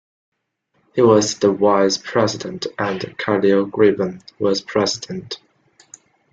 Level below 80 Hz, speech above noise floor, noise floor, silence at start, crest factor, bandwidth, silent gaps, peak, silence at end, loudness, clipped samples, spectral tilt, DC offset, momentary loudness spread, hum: -60 dBFS; 50 dB; -67 dBFS; 0.95 s; 18 dB; 8 kHz; none; -2 dBFS; 0.95 s; -18 LUFS; under 0.1%; -4.5 dB/octave; under 0.1%; 12 LU; none